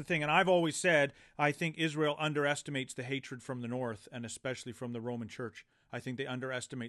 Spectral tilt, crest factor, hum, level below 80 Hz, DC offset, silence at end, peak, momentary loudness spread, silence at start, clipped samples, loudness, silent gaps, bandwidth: -4.5 dB/octave; 22 dB; none; -72 dBFS; under 0.1%; 0 s; -12 dBFS; 14 LU; 0 s; under 0.1%; -34 LUFS; none; 12.5 kHz